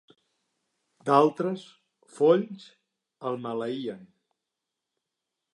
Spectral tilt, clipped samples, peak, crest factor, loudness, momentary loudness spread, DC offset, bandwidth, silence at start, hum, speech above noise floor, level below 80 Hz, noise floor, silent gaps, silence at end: -7 dB/octave; under 0.1%; -6 dBFS; 24 dB; -26 LUFS; 17 LU; under 0.1%; 11 kHz; 1.05 s; none; 60 dB; -84 dBFS; -86 dBFS; none; 1.5 s